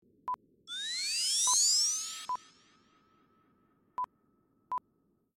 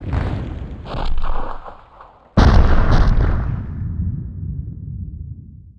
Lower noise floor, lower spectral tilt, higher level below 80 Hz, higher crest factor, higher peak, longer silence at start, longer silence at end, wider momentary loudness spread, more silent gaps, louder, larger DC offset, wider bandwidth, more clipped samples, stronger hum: first, -74 dBFS vs -44 dBFS; second, 4 dB/octave vs -8 dB/octave; second, -82 dBFS vs -20 dBFS; about the same, 18 dB vs 18 dB; second, -16 dBFS vs 0 dBFS; first, 0.25 s vs 0 s; first, 0.6 s vs 0.15 s; about the same, 18 LU vs 17 LU; neither; second, -30 LUFS vs -21 LUFS; neither; first, 17 kHz vs 6.4 kHz; neither; neither